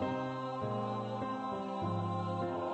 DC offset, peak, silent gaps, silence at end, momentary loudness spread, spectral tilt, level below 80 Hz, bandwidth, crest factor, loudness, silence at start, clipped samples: under 0.1%; -24 dBFS; none; 0 s; 2 LU; -8 dB/octave; -68 dBFS; 8.4 kHz; 12 dB; -37 LUFS; 0 s; under 0.1%